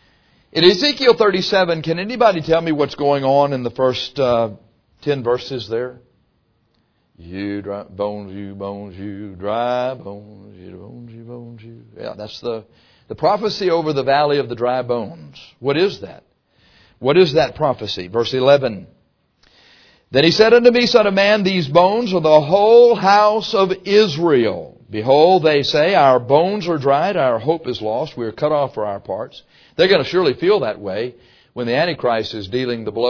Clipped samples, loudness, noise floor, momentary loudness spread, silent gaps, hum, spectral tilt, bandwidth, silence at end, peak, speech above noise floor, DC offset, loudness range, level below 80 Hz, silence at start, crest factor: under 0.1%; -16 LUFS; -63 dBFS; 18 LU; none; none; -6 dB/octave; 5.4 kHz; 0 s; 0 dBFS; 46 dB; under 0.1%; 13 LU; -54 dBFS; 0.55 s; 18 dB